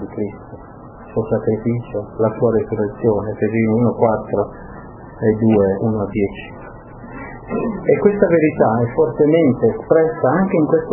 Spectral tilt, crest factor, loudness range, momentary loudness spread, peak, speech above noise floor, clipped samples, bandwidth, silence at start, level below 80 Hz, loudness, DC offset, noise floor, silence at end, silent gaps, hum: -13.5 dB/octave; 18 dB; 5 LU; 21 LU; 0 dBFS; 21 dB; under 0.1%; 3.2 kHz; 0 s; -42 dBFS; -17 LUFS; under 0.1%; -37 dBFS; 0 s; none; none